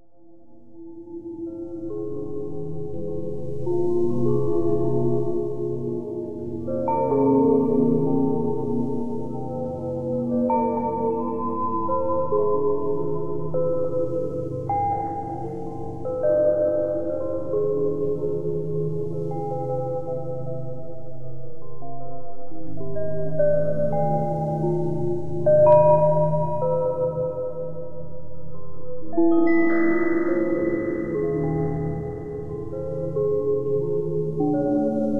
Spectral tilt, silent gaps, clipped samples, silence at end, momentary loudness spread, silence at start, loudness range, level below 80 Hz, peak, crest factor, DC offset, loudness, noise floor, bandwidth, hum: -11 dB/octave; none; under 0.1%; 0 s; 16 LU; 0 s; 9 LU; -50 dBFS; -4 dBFS; 18 dB; under 0.1%; -24 LUFS; -53 dBFS; 3.4 kHz; none